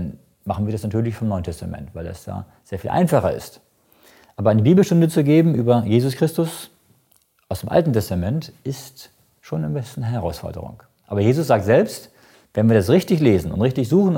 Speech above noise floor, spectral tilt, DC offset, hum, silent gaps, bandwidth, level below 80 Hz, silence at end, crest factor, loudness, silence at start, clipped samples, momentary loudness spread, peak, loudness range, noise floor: 42 dB; -7.5 dB/octave; under 0.1%; none; none; 17 kHz; -46 dBFS; 0 s; 18 dB; -19 LUFS; 0 s; under 0.1%; 18 LU; -2 dBFS; 7 LU; -61 dBFS